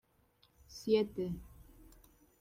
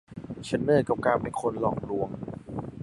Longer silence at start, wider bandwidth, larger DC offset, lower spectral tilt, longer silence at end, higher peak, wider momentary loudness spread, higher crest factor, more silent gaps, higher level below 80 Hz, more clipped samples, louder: first, 0.7 s vs 0.1 s; first, 16 kHz vs 11.5 kHz; neither; about the same, -6 dB/octave vs -7 dB/octave; first, 0.8 s vs 0 s; second, -18 dBFS vs -8 dBFS; about the same, 16 LU vs 14 LU; about the same, 22 dB vs 20 dB; neither; second, -60 dBFS vs -54 dBFS; neither; second, -36 LUFS vs -28 LUFS